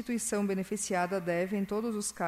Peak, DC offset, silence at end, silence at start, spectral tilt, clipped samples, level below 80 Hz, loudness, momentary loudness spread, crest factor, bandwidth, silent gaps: -18 dBFS; under 0.1%; 0 s; 0 s; -4.5 dB/octave; under 0.1%; -64 dBFS; -32 LUFS; 2 LU; 14 dB; 15.5 kHz; none